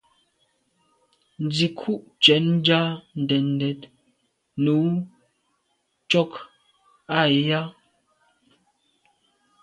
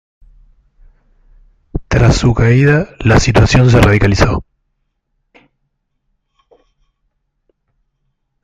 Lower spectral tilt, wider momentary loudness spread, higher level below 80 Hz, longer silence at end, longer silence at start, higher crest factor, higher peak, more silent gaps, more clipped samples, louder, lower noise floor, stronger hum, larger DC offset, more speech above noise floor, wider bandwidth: about the same, -6 dB/octave vs -6 dB/octave; first, 14 LU vs 9 LU; second, -68 dBFS vs -26 dBFS; second, 1.9 s vs 4 s; second, 1.4 s vs 1.75 s; first, 24 dB vs 14 dB; about the same, -2 dBFS vs 0 dBFS; neither; neither; second, -22 LUFS vs -11 LUFS; first, -72 dBFS vs -67 dBFS; neither; neither; second, 50 dB vs 58 dB; second, 10 kHz vs 11.5 kHz